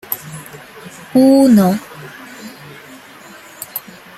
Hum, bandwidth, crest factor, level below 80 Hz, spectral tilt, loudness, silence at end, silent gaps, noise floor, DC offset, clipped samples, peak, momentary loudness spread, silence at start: none; 16 kHz; 16 dB; -56 dBFS; -6.5 dB/octave; -13 LUFS; 0.4 s; none; -38 dBFS; under 0.1%; under 0.1%; 0 dBFS; 27 LU; 0.1 s